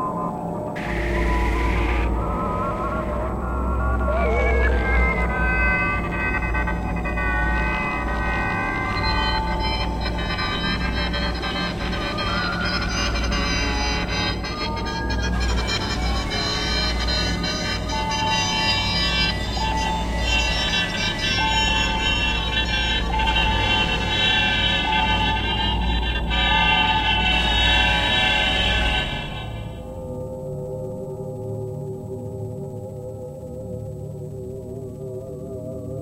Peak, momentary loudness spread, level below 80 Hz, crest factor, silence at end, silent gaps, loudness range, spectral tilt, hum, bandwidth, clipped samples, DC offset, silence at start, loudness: -4 dBFS; 14 LU; -28 dBFS; 18 dB; 0 s; none; 13 LU; -4 dB/octave; none; 12.5 kHz; under 0.1%; under 0.1%; 0 s; -21 LUFS